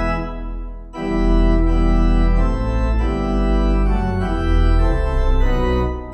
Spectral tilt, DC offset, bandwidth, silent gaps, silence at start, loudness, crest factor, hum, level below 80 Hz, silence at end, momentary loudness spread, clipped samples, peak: -8 dB/octave; under 0.1%; 6.2 kHz; none; 0 s; -19 LUFS; 12 dB; none; -18 dBFS; 0 s; 8 LU; under 0.1%; -4 dBFS